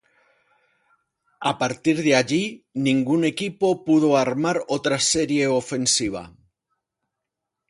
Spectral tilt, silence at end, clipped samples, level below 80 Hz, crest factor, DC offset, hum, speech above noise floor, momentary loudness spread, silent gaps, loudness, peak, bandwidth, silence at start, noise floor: -4 dB/octave; 1.4 s; under 0.1%; -58 dBFS; 22 dB; under 0.1%; none; 62 dB; 7 LU; none; -21 LUFS; -2 dBFS; 11.5 kHz; 1.4 s; -83 dBFS